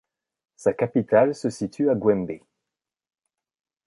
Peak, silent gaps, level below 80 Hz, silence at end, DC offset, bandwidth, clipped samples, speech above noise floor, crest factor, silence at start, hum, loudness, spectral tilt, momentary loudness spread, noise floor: -4 dBFS; none; -62 dBFS; 1.5 s; under 0.1%; 11.5 kHz; under 0.1%; 65 dB; 20 dB; 0.6 s; none; -23 LUFS; -7 dB/octave; 9 LU; -87 dBFS